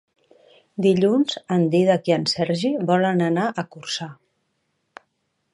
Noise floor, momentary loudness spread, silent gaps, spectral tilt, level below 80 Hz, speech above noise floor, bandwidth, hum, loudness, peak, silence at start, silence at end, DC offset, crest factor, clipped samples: -73 dBFS; 11 LU; none; -6 dB/octave; -66 dBFS; 52 dB; 11 kHz; none; -21 LUFS; -6 dBFS; 0.8 s; 1.4 s; under 0.1%; 18 dB; under 0.1%